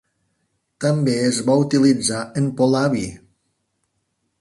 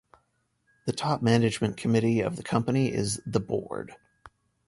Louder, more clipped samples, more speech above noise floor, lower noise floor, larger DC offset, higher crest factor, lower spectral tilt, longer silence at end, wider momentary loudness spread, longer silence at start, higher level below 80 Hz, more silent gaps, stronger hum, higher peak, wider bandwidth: first, -19 LUFS vs -27 LUFS; neither; first, 54 dB vs 46 dB; about the same, -72 dBFS vs -73 dBFS; neither; about the same, 16 dB vs 20 dB; about the same, -5.5 dB/octave vs -6 dB/octave; first, 1.25 s vs 0.4 s; second, 8 LU vs 12 LU; about the same, 0.8 s vs 0.85 s; about the same, -56 dBFS vs -56 dBFS; neither; neither; first, -4 dBFS vs -8 dBFS; about the same, 11.5 kHz vs 11.5 kHz